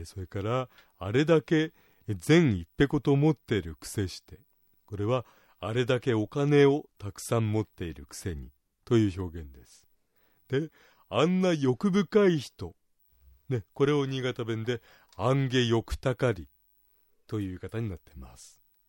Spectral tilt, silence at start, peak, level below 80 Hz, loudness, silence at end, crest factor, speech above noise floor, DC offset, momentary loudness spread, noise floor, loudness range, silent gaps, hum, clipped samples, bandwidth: -6.5 dB/octave; 0 s; -10 dBFS; -54 dBFS; -28 LUFS; 0.45 s; 18 dB; 40 dB; under 0.1%; 16 LU; -68 dBFS; 6 LU; none; none; under 0.1%; 16.5 kHz